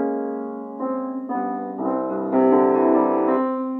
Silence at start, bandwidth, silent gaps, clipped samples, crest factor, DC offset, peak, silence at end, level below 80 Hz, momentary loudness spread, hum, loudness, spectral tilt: 0 s; 3.4 kHz; none; under 0.1%; 16 dB; under 0.1%; -6 dBFS; 0 s; -84 dBFS; 11 LU; none; -21 LUFS; -10.5 dB/octave